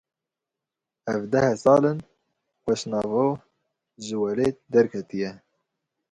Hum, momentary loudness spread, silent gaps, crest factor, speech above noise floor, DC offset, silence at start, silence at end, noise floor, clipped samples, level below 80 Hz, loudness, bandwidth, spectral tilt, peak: none; 16 LU; none; 20 dB; 65 dB; under 0.1%; 1.05 s; 0.75 s; -87 dBFS; under 0.1%; -60 dBFS; -24 LUFS; 11 kHz; -6.5 dB/octave; -6 dBFS